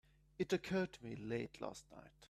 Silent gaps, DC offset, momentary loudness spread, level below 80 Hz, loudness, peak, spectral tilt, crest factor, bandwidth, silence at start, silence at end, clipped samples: none; under 0.1%; 13 LU; -70 dBFS; -43 LUFS; -24 dBFS; -6 dB/octave; 20 dB; 13.5 kHz; 0.4 s; 0.05 s; under 0.1%